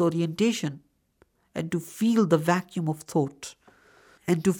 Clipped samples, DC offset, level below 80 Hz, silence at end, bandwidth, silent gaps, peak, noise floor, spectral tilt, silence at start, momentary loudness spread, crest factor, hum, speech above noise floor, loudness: under 0.1%; under 0.1%; -68 dBFS; 0 s; 19.5 kHz; none; -8 dBFS; -65 dBFS; -6 dB/octave; 0 s; 16 LU; 18 dB; none; 40 dB; -26 LUFS